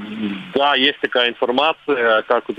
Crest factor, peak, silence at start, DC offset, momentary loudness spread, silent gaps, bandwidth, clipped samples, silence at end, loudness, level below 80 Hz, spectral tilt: 18 dB; 0 dBFS; 0 s; under 0.1%; 8 LU; none; 8.8 kHz; under 0.1%; 0.05 s; -17 LUFS; -64 dBFS; -5.5 dB/octave